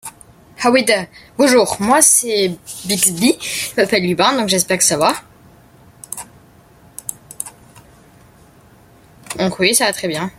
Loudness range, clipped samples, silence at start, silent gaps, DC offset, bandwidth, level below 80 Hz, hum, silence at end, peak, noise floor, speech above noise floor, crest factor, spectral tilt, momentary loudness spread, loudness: 19 LU; under 0.1%; 0.05 s; none; under 0.1%; 16.5 kHz; -54 dBFS; none; 0.1 s; 0 dBFS; -47 dBFS; 31 dB; 18 dB; -2.5 dB/octave; 18 LU; -14 LUFS